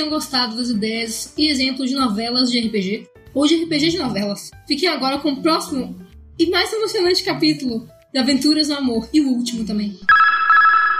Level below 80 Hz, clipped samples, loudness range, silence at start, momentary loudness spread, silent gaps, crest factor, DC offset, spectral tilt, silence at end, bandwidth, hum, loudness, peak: -50 dBFS; under 0.1%; 3 LU; 0 s; 12 LU; none; 14 dB; under 0.1%; -3.5 dB/octave; 0 s; 15.5 kHz; none; -18 LUFS; -4 dBFS